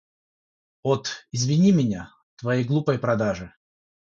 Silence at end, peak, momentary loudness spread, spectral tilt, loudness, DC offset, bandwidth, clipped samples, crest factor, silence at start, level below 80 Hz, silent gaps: 0.55 s; -8 dBFS; 15 LU; -6 dB/octave; -24 LUFS; under 0.1%; 7.8 kHz; under 0.1%; 18 dB; 0.85 s; -56 dBFS; 2.23-2.37 s